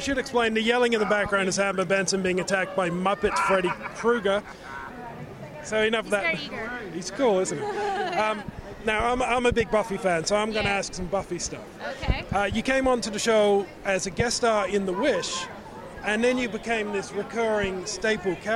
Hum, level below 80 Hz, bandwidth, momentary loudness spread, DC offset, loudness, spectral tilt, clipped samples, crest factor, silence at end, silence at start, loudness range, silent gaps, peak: none; -44 dBFS; 15 kHz; 10 LU; under 0.1%; -25 LUFS; -4 dB/octave; under 0.1%; 18 dB; 0 s; 0 s; 3 LU; none; -8 dBFS